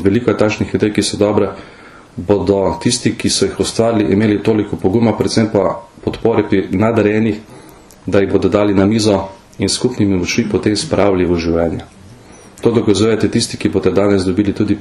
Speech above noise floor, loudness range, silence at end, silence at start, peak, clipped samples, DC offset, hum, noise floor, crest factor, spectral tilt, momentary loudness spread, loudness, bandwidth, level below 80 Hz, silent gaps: 25 dB; 1 LU; 0 s; 0 s; 0 dBFS; under 0.1%; under 0.1%; none; -39 dBFS; 14 dB; -5.5 dB/octave; 6 LU; -15 LUFS; 12.5 kHz; -40 dBFS; none